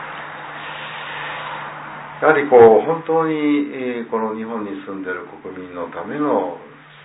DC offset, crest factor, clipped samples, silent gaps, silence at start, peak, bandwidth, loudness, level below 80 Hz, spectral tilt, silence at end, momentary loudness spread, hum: under 0.1%; 18 dB; under 0.1%; none; 0 s; 0 dBFS; 4 kHz; -18 LUFS; -62 dBFS; -10 dB/octave; 0 s; 20 LU; none